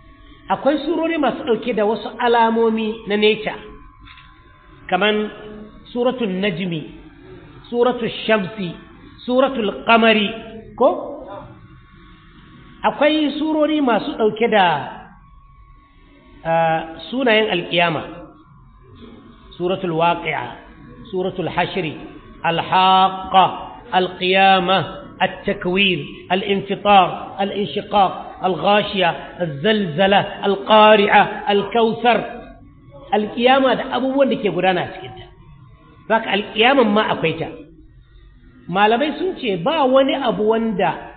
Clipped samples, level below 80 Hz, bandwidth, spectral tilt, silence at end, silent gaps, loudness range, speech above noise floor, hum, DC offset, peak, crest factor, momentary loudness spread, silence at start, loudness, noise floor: under 0.1%; -50 dBFS; 4.7 kHz; -10.5 dB/octave; 0 s; none; 7 LU; 31 dB; none; under 0.1%; -2 dBFS; 18 dB; 15 LU; 0.5 s; -18 LUFS; -48 dBFS